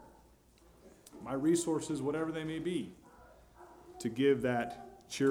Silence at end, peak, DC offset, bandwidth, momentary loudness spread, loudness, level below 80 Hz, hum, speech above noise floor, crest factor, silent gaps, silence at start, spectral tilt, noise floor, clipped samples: 0 s; -18 dBFS; under 0.1%; 16.5 kHz; 20 LU; -34 LUFS; -66 dBFS; none; 30 dB; 18 dB; none; 0 s; -5 dB/octave; -63 dBFS; under 0.1%